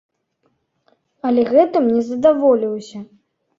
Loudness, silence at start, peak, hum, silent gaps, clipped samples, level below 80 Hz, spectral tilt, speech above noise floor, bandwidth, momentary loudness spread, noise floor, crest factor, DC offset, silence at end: -16 LUFS; 1.25 s; -2 dBFS; none; none; under 0.1%; -62 dBFS; -7 dB/octave; 51 dB; 7.6 kHz; 15 LU; -67 dBFS; 16 dB; under 0.1%; 0.55 s